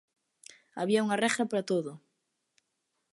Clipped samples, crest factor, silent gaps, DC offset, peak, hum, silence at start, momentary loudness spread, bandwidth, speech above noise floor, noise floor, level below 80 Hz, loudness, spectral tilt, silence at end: under 0.1%; 20 dB; none; under 0.1%; -12 dBFS; none; 0.75 s; 13 LU; 11.5 kHz; 52 dB; -81 dBFS; -82 dBFS; -29 LUFS; -4.5 dB/octave; 1.15 s